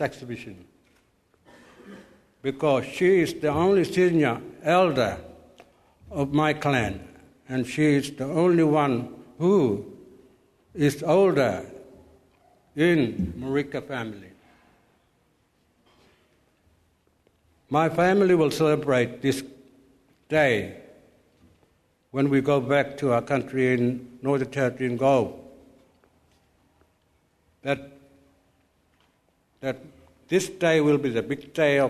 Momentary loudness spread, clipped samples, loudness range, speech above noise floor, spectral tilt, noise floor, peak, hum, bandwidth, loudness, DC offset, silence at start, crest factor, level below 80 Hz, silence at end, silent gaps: 14 LU; under 0.1%; 12 LU; 44 dB; -6.5 dB/octave; -67 dBFS; -8 dBFS; none; 13.5 kHz; -24 LUFS; under 0.1%; 0 s; 18 dB; -58 dBFS; 0 s; none